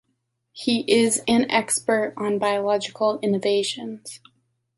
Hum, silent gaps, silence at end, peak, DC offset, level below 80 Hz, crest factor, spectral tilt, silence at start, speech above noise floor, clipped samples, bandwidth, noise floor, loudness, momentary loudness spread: none; none; 0.6 s; -6 dBFS; under 0.1%; -64 dBFS; 18 dB; -3 dB/octave; 0.55 s; 52 dB; under 0.1%; 12 kHz; -74 dBFS; -22 LUFS; 11 LU